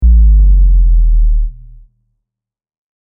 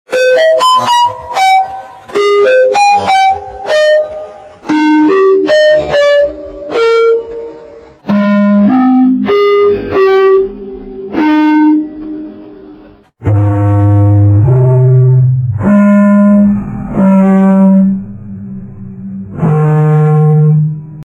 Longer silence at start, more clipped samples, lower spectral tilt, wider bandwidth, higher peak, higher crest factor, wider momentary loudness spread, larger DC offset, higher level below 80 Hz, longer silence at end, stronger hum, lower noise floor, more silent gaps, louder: about the same, 0 s vs 0.1 s; neither; first, -15 dB/octave vs -7.5 dB/octave; second, 0.4 kHz vs 11.5 kHz; about the same, 0 dBFS vs 0 dBFS; about the same, 8 dB vs 8 dB; second, 9 LU vs 18 LU; neither; first, -10 dBFS vs -40 dBFS; first, 1.5 s vs 0.1 s; neither; first, -85 dBFS vs -37 dBFS; neither; second, -12 LUFS vs -9 LUFS